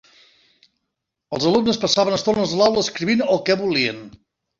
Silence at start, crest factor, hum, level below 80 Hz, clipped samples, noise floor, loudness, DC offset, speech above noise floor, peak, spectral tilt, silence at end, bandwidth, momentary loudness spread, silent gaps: 1.3 s; 18 dB; none; -56 dBFS; under 0.1%; -79 dBFS; -19 LUFS; under 0.1%; 60 dB; -2 dBFS; -4 dB/octave; 0.5 s; 7.6 kHz; 5 LU; none